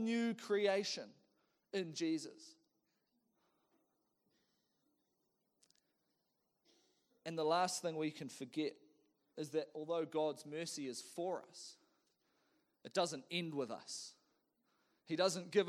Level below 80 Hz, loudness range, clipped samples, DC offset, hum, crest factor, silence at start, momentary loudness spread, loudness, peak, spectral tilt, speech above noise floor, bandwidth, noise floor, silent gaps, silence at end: under -90 dBFS; 6 LU; under 0.1%; under 0.1%; none; 22 dB; 0 s; 17 LU; -41 LUFS; -20 dBFS; -4 dB/octave; 44 dB; 18 kHz; -85 dBFS; none; 0 s